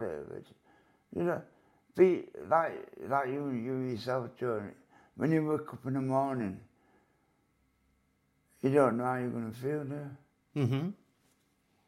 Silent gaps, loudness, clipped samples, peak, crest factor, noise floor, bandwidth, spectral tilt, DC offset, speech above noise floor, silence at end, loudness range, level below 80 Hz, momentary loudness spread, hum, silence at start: none; -33 LUFS; under 0.1%; -12 dBFS; 22 dB; -74 dBFS; 15 kHz; -8.5 dB/octave; under 0.1%; 42 dB; 0.95 s; 3 LU; -76 dBFS; 16 LU; none; 0 s